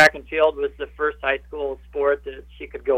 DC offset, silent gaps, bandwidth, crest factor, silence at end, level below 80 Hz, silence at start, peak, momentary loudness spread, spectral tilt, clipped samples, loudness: under 0.1%; none; 16 kHz; 18 dB; 0 s; -46 dBFS; 0 s; -4 dBFS; 13 LU; -3.5 dB/octave; under 0.1%; -23 LUFS